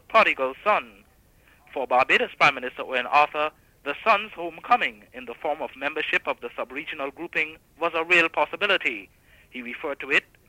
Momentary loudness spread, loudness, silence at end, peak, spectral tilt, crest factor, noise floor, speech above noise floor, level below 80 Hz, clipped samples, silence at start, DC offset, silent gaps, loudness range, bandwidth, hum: 15 LU; -24 LUFS; 0.25 s; -6 dBFS; -3.5 dB/octave; 20 dB; -58 dBFS; 33 dB; -62 dBFS; under 0.1%; 0.1 s; under 0.1%; none; 4 LU; 16 kHz; none